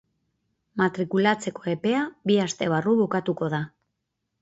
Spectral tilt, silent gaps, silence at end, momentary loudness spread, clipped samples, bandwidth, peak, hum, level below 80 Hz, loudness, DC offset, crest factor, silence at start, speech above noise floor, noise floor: -5.5 dB/octave; none; 0.75 s; 7 LU; under 0.1%; 8 kHz; -8 dBFS; none; -66 dBFS; -25 LUFS; under 0.1%; 18 dB; 0.75 s; 56 dB; -80 dBFS